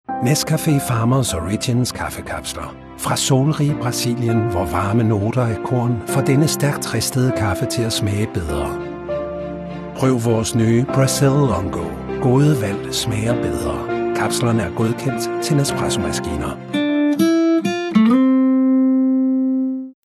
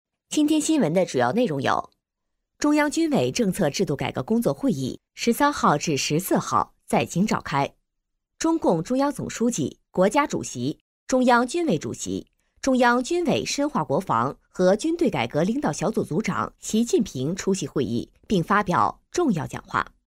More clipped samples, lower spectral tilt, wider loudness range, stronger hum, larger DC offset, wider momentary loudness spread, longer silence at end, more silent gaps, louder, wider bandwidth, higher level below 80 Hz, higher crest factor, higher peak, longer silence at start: neither; about the same, -5.5 dB/octave vs -5 dB/octave; about the same, 4 LU vs 2 LU; neither; neither; about the same, 10 LU vs 8 LU; second, 0.15 s vs 0.35 s; second, none vs 10.81-11.06 s; first, -18 LUFS vs -24 LUFS; second, 13.5 kHz vs 16 kHz; first, -40 dBFS vs -54 dBFS; about the same, 14 dB vs 18 dB; about the same, -4 dBFS vs -6 dBFS; second, 0.1 s vs 0.3 s